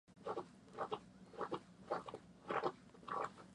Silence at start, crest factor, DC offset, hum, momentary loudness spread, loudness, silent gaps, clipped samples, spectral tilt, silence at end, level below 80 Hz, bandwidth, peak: 0.1 s; 22 dB; under 0.1%; none; 13 LU; -47 LUFS; none; under 0.1%; -5.5 dB/octave; 0 s; -78 dBFS; 11 kHz; -24 dBFS